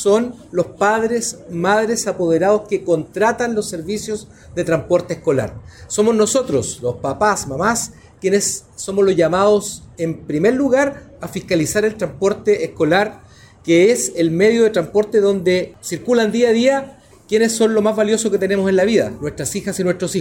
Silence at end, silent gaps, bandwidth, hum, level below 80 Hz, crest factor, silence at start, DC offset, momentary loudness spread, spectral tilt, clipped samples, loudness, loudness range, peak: 0 s; none; 16.5 kHz; none; -48 dBFS; 14 dB; 0 s; under 0.1%; 10 LU; -4.5 dB/octave; under 0.1%; -17 LUFS; 3 LU; -4 dBFS